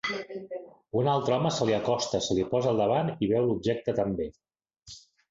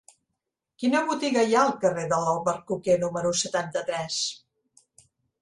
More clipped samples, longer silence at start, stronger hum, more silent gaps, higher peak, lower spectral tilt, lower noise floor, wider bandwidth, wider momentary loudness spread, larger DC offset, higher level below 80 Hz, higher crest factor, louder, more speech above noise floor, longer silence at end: neither; second, 0.05 s vs 0.8 s; neither; neither; second, -12 dBFS vs -8 dBFS; first, -5.5 dB/octave vs -3.5 dB/octave; second, -52 dBFS vs -83 dBFS; second, 8 kHz vs 11.5 kHz; first, 16 LU vs 8 LU; neither; first, -58 dBFS vs -66 dBFS; about the same, 16 dB vs 18 dB; second, -28 LUFS vs -25 LUFS; second, 25 dB vs 58 dB; second, 0.3 s vs 1.05 s